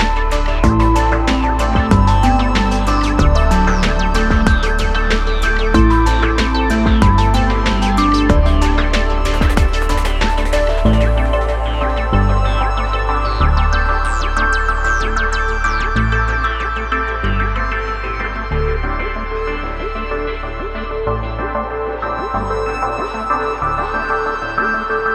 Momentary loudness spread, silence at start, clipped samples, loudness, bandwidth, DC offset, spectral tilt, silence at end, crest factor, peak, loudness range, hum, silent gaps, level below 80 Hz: 8 LU; 0 s; under 0.1%; -16 LUFS; 11.5 kHz; under 0.1%; -6 dB/octave; 0 s; 14 dB; 0 dBFS; 7 LU; none; none; -16 dBFS